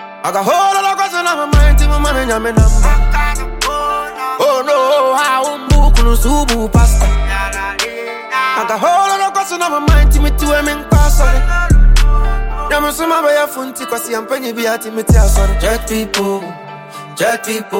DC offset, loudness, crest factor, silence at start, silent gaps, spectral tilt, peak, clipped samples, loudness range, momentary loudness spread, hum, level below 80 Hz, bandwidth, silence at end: under 0.1%; -14 LUFS; 12 dB; 0 s; none; -4.5 dB/octave; 0 dBFS; under 0.1%; 3 LU; 8 LU; none; -14 dBFS; 17 kHz; 0 s